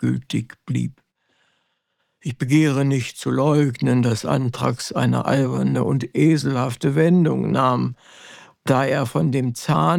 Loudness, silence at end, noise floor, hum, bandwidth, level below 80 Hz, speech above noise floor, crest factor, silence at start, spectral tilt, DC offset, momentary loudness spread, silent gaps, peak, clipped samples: -20 LUFS; 0 s; -72 dBFS; none; 15.5 kHz; -58 dBFS; 53 dB; 16 dB; 0 s; -7 dB/octave; under 0.1%; 10 LU; none; -4 dBFS; under 0.1%